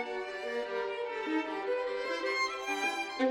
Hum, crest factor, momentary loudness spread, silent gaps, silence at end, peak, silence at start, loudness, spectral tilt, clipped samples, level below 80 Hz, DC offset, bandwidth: none; 16 dB; 5 LU; none; 0 s; -18 dBFS; 0 s; -34 LUFS; -1.5 dB/octave; under 0.1%; -72 dBFS; under 0.1%; 16.5 kHz